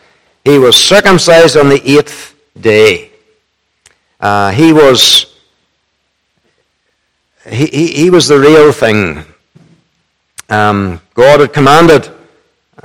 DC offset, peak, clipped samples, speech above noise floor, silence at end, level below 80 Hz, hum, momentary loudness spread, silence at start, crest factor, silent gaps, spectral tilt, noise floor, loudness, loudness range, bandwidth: under 0.1%; 0 dBFS; 4%; 56 dB; 0.75 s; -42 dBFS; none; 13 LU; 0.45 s; 8 dB; none; -4 dB/octave; -62 dBFS; -6 LUFS; 4 LU; 19 kHz